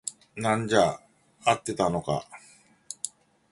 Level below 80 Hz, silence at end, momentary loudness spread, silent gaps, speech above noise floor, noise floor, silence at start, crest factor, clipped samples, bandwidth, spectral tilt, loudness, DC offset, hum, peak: -58 dBFS; 0.45 s; 16 LU; none; 21 dB; -47 dBFS; 0.05 s; 22 dB; under 0.1%; 11.5 kHz; -4.5 dB/octave; -27 LUFS; under 0.1%; none; -6 dBFS